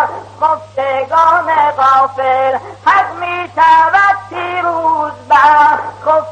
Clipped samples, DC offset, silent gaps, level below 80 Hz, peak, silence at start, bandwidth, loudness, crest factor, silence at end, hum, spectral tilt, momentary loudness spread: under 0.1%; under 0.1%; none; -52 dBFS; 0 dBFS; 0 s; 9 kHz; -11 LUFS; 12 dB; 0 s; none; -4.5 dB/octave; 10 LU